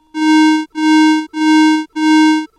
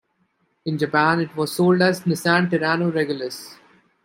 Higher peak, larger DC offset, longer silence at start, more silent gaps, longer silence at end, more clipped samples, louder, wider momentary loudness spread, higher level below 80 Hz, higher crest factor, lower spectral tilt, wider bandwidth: second, -8 dBFS vs -2 dBFS; neither; second, 0.15 s vs 0.65 s; neither; second, 0.1 s vs 0.5 s; neither; first, -11 LUFS vs -20 LUFS; second, 4 LU vs 13 LU; about the same, -70 dBFS vs -66 dBFS; second, 4 dB vs 18 dB; second, -1.5 dB/octave vs -5.5 dB/octave; second, 11 kHz vs 16 kHz